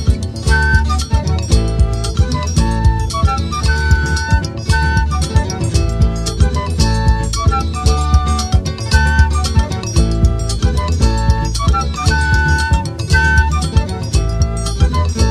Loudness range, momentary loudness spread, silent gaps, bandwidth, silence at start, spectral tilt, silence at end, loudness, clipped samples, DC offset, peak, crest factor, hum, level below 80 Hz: 1 LU; 4 LU; none; 12 kHz; 0 s; -5 dB/octave; 0 s; -15 LUFS; under 0.1%; under 0.1%; 0 dBFS; 14 dB; none; -16 dBFS